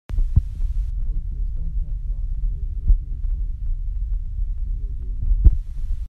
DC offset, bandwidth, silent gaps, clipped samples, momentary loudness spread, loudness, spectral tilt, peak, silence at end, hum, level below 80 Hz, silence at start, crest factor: under 0.1%; 0.9 kHz; none; under 0.1%; 10 LU; -27 LUFS; -10 dB/octave; 0 dBFS; 0 s; none; -22 dBFS; 0.1 s; 20 dB